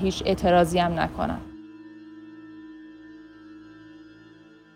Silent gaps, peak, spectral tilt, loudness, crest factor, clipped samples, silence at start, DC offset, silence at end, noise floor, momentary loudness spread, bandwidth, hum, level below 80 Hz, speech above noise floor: none; -8 dBFS; -6 dB/octave; -23 LUFS; 20 dB; under 0.1%; 0 s; under 0.1%; 0.7 s; -51 dBFS; 27 LU; 16.5 kHz; none; -46 dBFS; 28 dB